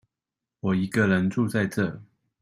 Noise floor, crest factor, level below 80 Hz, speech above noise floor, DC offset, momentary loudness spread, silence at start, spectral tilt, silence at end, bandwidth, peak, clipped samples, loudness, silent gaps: -88 dBFS; 16 dB; -60 dBFS; 64 dB; under 0.1%; 9 LU; 0.65 s; -7 dB/octave; 0.4 s; 15 kHz; -10 dBFS; under 0.1%; -25 LUFS; none